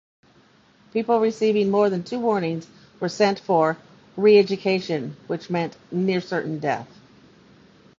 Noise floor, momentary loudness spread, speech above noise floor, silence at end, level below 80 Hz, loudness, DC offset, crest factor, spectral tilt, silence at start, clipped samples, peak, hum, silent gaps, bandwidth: -56 dBFS; 13 LU; 35 dB; 1.15 s; -66 dBFS; -22 LUFS; under 0.1%; 18 dB; -6.5 dB/octave; 0.95 s; under 0.1%; -4 dBFS; none; none; 7.6 kHz